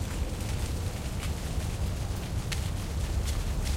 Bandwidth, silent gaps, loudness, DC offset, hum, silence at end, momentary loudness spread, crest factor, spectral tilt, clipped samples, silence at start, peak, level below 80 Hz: 16 kHz; none; -33 LUFS; under 0.1%; none; 0 s; 2 LU; 14 dB; -5 dB/octave; under 0.1%; 0 s; -16 dBFS; -34 dBFS